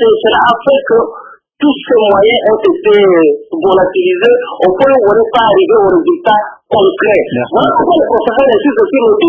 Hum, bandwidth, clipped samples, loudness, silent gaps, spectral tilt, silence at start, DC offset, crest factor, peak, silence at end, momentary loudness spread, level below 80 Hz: none; 4 kHz; 0.2%; -9 LUFS; none; -7.5 dB/octave; 0 s; under 0.1%; 8 dB; 0 dBFS; 0 s; 5 LU; -46 dBFS